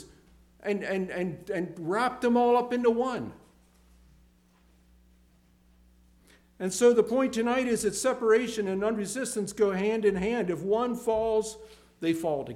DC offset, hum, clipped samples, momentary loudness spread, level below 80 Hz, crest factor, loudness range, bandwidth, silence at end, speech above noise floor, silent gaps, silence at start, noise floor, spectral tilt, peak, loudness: under 0.1%; 60 Hz at -50 dBFS; under 0.1%; 10 LU; -60 dBFS; 18 dB; 6 LU; 15.5 kHz; 0 s; 35 dB; none; 0 s; -62 dBFS; -5 dB/octave; -10 dBFS; -28 LUFS